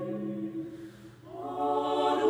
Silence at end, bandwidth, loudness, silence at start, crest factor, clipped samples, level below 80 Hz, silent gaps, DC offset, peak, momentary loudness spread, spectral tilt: 0 s; 14 kHz; -33 LUFS; 0 s; 16 dB; under 0.1%; -68 dBFS; none; under 0.1%; -16 dBFS; 19 LU; -6 dB/octave